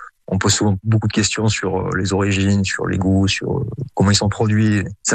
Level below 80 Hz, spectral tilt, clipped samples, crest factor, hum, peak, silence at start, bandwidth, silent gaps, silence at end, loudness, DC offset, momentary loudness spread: -44 dBFS; -4.5 dB/octave; under 0.1%; 14 dB; none; -4 dBFS; 0 s; 9.4 kHz; none; 0 s; -18 LUFS; under 0.1%; 5 LU